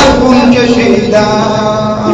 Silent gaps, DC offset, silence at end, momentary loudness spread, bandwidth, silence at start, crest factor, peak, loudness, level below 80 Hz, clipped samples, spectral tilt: none; under 0.1%; 0 s; 5 LU; 8.4 kHz; 0 s; 8 dB; 0 dBFS; -8 LUFS; -28 dBFS; 3%; -5.5 dB/octave